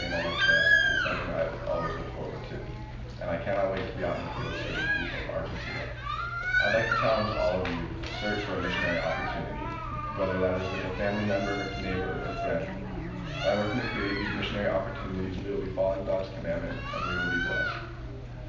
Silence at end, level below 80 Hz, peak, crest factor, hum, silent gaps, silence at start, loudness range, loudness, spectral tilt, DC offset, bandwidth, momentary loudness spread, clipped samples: 0 s; -42 dBFS; -12 dBFS; 18 dB; none; none; 0 s; 4 LU; -29 LUFS; -5.5 dB/octave; under 0.1%; 7.6 kHz; 11 LU; under 0.1%